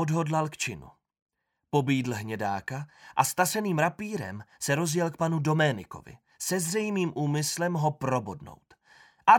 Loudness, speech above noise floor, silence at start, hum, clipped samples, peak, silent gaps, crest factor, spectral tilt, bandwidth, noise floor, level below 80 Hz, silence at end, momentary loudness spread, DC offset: -28 LUFS; 30 dB; 0 s; none; under 0.1%; -6 dBFS; 1.22-1.26 s; 22 dB; -5 dB/octave; 18 kHz; -59 dBFS; -66 dBFS; 0 s; 12 LU; under 0.1%